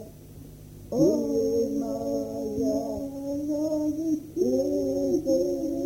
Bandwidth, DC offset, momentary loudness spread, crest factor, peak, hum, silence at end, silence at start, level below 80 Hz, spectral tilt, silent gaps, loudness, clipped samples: 17 kHz; under 0.1%; 16 LU; 16 dB; -10 dBFS; none; 0 s; 0 s; -52 dBFS; -7 dB/octave; none; -27 LUFS; under 0.1%